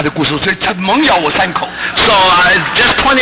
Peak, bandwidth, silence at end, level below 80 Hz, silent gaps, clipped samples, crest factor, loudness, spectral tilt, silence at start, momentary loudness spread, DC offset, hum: -4 dBFS; 4 kHz; 0 s; -36 dBFS; none; under 0.1%; 8 dB; -10 LUFS; -8 dB/octave; 0 s; 7 LU; under 0.1%; none